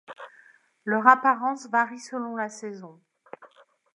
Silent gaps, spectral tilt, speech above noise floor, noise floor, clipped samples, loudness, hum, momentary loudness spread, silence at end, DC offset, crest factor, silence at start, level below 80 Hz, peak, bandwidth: none; -4.5 dB/octave; 33 dB; -58 dBFS; under 0.1%; -24 LUFS; none; 25 LU; 0.5 s; under 0.1%; 26 dB; 0.1 s; -86 dBFS; -2 dBFS; 11 kHz